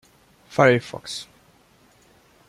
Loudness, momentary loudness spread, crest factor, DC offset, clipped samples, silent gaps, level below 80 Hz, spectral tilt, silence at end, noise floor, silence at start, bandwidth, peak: -22 LUFS; 17 LU; 24 dB; under 0.1%; under 0.1%; none; -64 dBFS; -5.5 dB/octave; 1.25 s; -57 dBFS; 0.55 s; 14 kHz; -2 dBFS